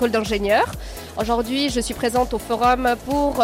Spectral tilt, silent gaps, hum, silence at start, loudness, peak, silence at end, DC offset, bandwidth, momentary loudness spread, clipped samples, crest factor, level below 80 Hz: -4 dB/octave; none; none; 0 s; -21 LUFS; -6 dBFS; 0 s; under 0.1%; 16 kHz; 7 LU; under 0.1%; 14 dB; -36 dBFS